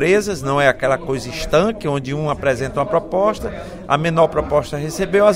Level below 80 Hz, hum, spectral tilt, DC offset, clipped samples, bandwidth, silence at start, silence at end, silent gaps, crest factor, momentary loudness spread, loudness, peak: -38 dBFS; none; -5.5 dB/octave; under 0.1%; under 0.1%; 16 kHz; 0 s; 0 s; none; 18 dB; 8 LU; -18 LUFS; 0 dBFS